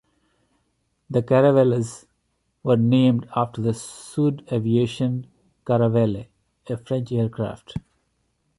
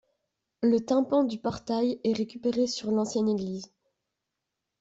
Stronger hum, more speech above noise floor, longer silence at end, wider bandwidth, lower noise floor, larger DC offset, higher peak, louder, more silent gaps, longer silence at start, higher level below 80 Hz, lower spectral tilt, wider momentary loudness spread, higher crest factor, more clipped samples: neither; second, 50 dB vs 58 dB; second, 0.8 s vs 1.15 s; first, 11.5 kHz vs 8 kHz; second, -71 dBFS vs -85 dBFS; neither; first, -6 dBFS vs -14 dBFS; first, -22 LUFS vs -28 LUFS; neither; first, 1.1 s vs 0.6 s; first, -56 dBFS vs -66 dBFS; first, -7.5 dB/octave vs -6 dB/octave; first, 16 LU vs 7 LU; about the same, 18 dB vs 16 dB; neither